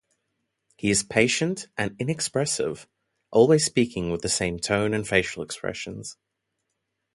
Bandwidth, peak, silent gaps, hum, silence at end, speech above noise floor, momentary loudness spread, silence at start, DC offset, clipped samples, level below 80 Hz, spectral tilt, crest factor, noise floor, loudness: 11.5 kHz; -4 dBFS; none; none; 1 s; 55 dB; 12 LU; 0.85 s; under 0.1%; under 0.1%; -52 dBFS; -4 dB/octave; 22 dB; -79 dBFS; -24 LUFS